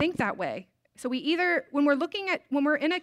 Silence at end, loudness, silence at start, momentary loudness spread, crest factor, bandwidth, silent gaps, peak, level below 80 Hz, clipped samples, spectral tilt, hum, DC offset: 0 s; -27 LUFS; 0 s; 9 LU; 14 dB; 12.5 kHz; none; -14 dBFS; -68 dBFS; under 0.1%; -5 dB/octave; none; under 0.1%